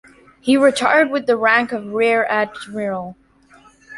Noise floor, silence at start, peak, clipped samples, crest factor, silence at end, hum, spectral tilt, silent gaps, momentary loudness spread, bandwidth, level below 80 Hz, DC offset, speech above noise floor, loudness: -50 dBFS; 0.45 s; -2 dBFS; under 0.1%; 16 dB; 0 s; none; -4 dB/octave; none; 12 LU; 11.5 kHz; -60 dBFS; under 0.1%; 33 dB; -17 LUFS